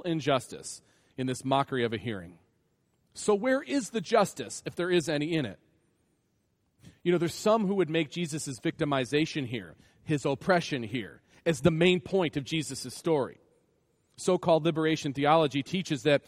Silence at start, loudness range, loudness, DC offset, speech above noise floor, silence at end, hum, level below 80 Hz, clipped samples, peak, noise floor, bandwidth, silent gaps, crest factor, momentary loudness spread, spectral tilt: 0.05 s; 3 LU; -29 LUFS; under 0.1%; 45 dB; 0.1 s; none; -64 dBFS; under 0.1%; -8 dBFS; -74 dBFS; 15 kHz; none; 20 dB; 12 LU; -5 dB/octave